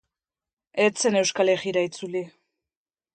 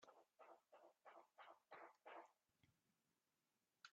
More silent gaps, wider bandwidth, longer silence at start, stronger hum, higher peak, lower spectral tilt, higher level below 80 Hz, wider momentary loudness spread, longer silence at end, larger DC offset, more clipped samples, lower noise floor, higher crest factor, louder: neither; first, 9.2 kHz vs 7.2 kHz; first, 0.75 s vs 0 s; neither; first, -6 dBFS vs -46 dBFS; first, -3 dB/octave vs -0.5 dB/octave; first, -74 dBFS vs under -90 dBFS; first, 11 LU vs 6 LU; first, 0.85 s vs 0 s; neither; neither; about the same, under -90 dBFS vs under -90 dBFS; about the same, 20 dB vs 22 dB; first, -24 LUFS vs -66 LUFS